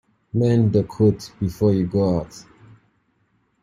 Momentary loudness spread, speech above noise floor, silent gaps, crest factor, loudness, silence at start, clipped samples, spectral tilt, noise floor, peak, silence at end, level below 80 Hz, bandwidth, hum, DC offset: 10 LU; 46 dB; none; 16 dB; -20 LUFS; 0.35 s; under 0.1%; -8.5 dB/octave; -66 dBFS; -4 dBFS; 1.2 s; -48 dBFS; 13 kHz; none; under 0.1%